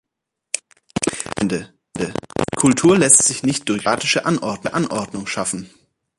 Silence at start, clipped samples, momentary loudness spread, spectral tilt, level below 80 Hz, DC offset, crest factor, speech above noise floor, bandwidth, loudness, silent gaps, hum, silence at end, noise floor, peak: 0.55 s; under 0.1%; 16 LU; -3.5 dB/octave; -50 dBFS; under 0.1%; 20 dB; 63 dB; 12 kHz; -18 LUFS; none; none; 0.5 s; -81 dBFS; 0 dBFS